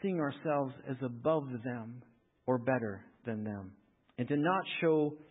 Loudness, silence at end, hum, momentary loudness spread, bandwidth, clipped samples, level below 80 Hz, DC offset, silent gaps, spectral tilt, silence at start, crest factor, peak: -35 LUFS; 0.05 s; none; 14 LU; 3.9 kHz; under 0.1%; -72 dBFS; under 0.1%; none; -4 dB/octave; 0 s; 18 dB; -18 dBFS